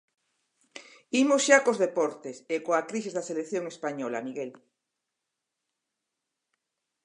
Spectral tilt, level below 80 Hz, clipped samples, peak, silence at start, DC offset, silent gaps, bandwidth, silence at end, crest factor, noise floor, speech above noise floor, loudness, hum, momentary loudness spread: -3 dB/octave; -86 dBFS; under 0.1%; -4 dBFS; 0.75 s; under 0.1%; none; 11 kHz; 2.5 s; 26 dB; -85 dBFS; 58 dB; -27 LUFS; none; 20 LU